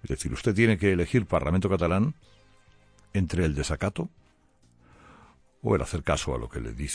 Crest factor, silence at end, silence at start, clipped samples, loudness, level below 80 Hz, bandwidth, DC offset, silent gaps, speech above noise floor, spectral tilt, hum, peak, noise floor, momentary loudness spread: 18 dB; 0 s; 0 s; under 0.1%; -27 LUFS; -40 dBFS; 10.5 kHz; under 0.1%; none; 36 dB; -6 dB/octave; none; -8 dBFS; -62 dBFS; 12 LU